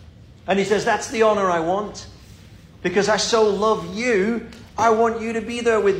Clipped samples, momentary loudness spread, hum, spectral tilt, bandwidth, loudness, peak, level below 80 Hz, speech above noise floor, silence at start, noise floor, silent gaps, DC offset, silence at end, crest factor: under 0.1%; 11 LU; none; -4 dB/octave; 12 kHz; -20 LUFS; -4 dBFS; -50 dBFS; 25 dB; 0 s; -44 dBFS; none; under 0.1%; 0 s; 16 dB